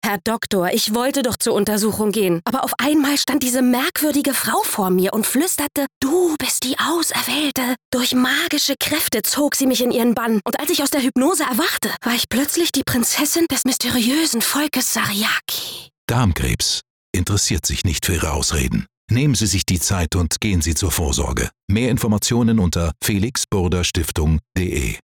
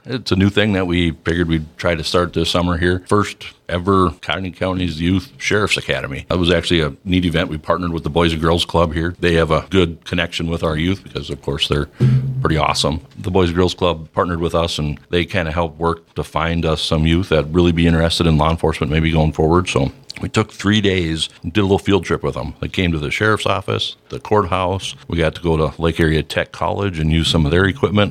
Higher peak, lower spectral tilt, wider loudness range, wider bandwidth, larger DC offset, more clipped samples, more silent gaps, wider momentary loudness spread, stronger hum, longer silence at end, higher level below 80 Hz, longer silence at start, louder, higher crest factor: second, -8 dBFS vs 0 dBFS; second, -3.5 dB/octave vs -6 dB/octave; about the same, 2 LU vs 3 LU; first, over 20 kHz vs 14.5 kHz; neither; neither; first, 5.96-6.01 s, 7.85-7.92 s, 15.98-16.08 s, 16.90-17.13 s, 18.97-19.08 s, 21.63-21.68 s vs none; second, 4 LU vs 7 LU; neither; about the same, 0.05 s vs 0 s; about the same, -34 dBFS vs -32 dBFS; about the same, 0.05 s vs 0.05 s; about the same, -18 LUFS vs -18 LUFS; second, 10 dB vs 18 dB